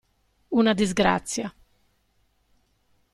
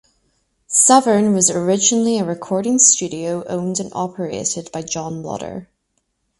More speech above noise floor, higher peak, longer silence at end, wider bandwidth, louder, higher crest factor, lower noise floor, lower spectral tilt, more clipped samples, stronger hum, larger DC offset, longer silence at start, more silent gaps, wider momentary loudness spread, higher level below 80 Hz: second, 45 dB vs 52 dB; second, -6 dBFS vs 0 dBFS; first, 1.65 s vs 0.75 s; first, 13 kHz vs 11.5 kHz; second, -23 LUFS vs -16 LUFS; about the same, 20 dB vs 18 dB; about the same, -68 dBFS vs -70 dBFS; about the same, -4.5 dB/octave vs -3.5 dB/octave; neither; first, 50 Hz at -55 dBFS vs none; neither; second, 0.5 s vs 0.7 s; neither; second, 10 LU vs 15 LU; first, -52 dBFS vs -58 dBFS